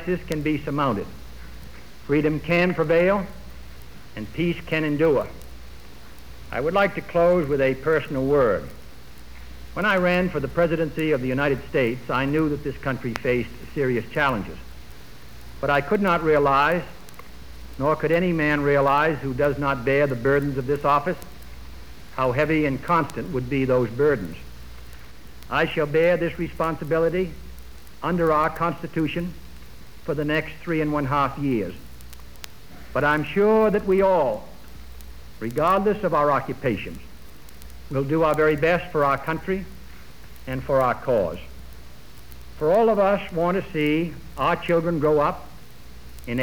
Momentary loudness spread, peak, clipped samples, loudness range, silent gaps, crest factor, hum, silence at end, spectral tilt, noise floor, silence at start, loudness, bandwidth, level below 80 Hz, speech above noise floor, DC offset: 23 LU; -6 dBFS; under 0.1%; 4 LU; none; 18 dB; none; 0 s; -7 dB/octave; -44 dBFS; 0 s; -22 LUFS; over 20 kHz; -44 dBFS; 23 dB; 1%